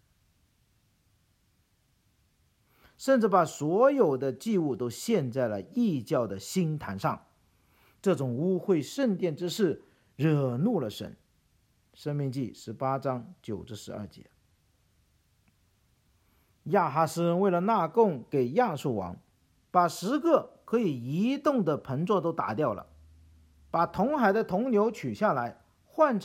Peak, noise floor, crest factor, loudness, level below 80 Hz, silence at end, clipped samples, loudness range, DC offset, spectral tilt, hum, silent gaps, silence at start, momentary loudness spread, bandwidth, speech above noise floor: -8 dBFS; -70 dBFS; 20 dB; -28 LUFS; -66 dBFS; 0 s; under 0.1%; 9 LU; under 0.1%; -6.5 dB/octave; none; none; 3 s; 13 LU; 16.5 kHz; 42 dB